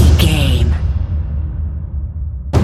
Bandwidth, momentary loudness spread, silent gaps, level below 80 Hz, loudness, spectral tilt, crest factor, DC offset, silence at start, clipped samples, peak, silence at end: 14 kHz; 12 LU; none; -16 dBFS; -17 LUFS; -6 dB/octave; 14 dB; under 0.1%; 0 s; under 0.1%; 0 dBFS; 0 s